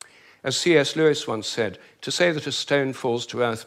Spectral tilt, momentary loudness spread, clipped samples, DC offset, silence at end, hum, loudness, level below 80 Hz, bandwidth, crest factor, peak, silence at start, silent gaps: -4 dB/octave; 10 LU; under 0.1%; under 0.1%; 0 s; none; -23 LUFS; -70 dBFS; 15 kHz; 18 dB; -4 dBFS; 0.45 s; none